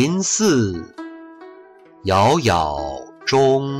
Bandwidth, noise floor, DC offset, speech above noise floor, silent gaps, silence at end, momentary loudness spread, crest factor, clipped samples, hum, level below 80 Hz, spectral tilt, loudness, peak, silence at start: 14.5 kHz; -45 dBFS; under 0.1%; 28 dB; none; 0 s; 20 LU; 12 dB; under 0.1%; none; -44 dBFS; -4.5 dB/octave; -18 LUFS; -8 dBFS; 0 s